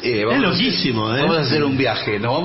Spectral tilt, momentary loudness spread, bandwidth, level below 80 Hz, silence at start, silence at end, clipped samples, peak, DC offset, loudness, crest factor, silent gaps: -8.5 dB/octave; 3 LU; 6 kHz; -48 dBFS; 0 s; 0 s; under 0.1%; -6 dBFS; under 0.1%; -18 LUFS; 12 dB; none